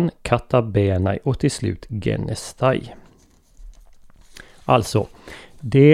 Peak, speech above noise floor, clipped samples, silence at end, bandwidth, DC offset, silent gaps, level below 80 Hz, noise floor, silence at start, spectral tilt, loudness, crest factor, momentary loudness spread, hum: -2 dBFS; 35 dB; under 0.1%; 0 s; 14 kHz; under 0.1%; none; -42 dBFS; -53 dBFS; 0 s; -7 dB/octave; -21 LUFS; 20 dB; 16 LU; none